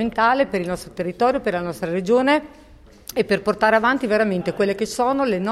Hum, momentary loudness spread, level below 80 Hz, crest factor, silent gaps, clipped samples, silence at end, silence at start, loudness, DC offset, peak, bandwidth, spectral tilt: none; 8 LU; -50 dBFS; 16 dB; none; under 0.1%; 0 s; 0 s; -20 LUFS; under 0.1%; -4 dBFS; 16 kHz; -5.5 dB/octave